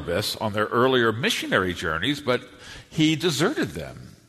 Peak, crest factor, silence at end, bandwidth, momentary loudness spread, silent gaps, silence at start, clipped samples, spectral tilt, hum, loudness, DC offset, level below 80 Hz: -6 dBFS; 18 dB; 0.2 s; 13.5 kHz; 14 LU; none; 0 s; under 0.1%; -4.5 dB/octave; none; -23 LUFS; under 0.1%; -52 dBFS